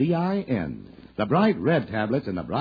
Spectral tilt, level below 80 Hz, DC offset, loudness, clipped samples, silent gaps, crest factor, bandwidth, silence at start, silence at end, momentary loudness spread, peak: -10 dB/octave; -54 dBFS; under 0.1%; -25 LUFS; under 0.1%; none; 16 dB; 5 kHz; 0 s; 0 s; 12 LU; -8 dBFS